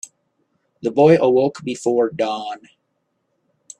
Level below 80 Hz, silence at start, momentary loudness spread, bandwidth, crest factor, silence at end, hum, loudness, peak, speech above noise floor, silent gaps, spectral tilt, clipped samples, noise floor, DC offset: -66 dBFS; 0.85 s; 18 LU; 10 kHz; 18 dB; 1.25 s; none; -18 LUFS; -2 dBFS; 54 dB; none; -6 dB/octave; under 0.1%; -71 dBFS; under 0.1%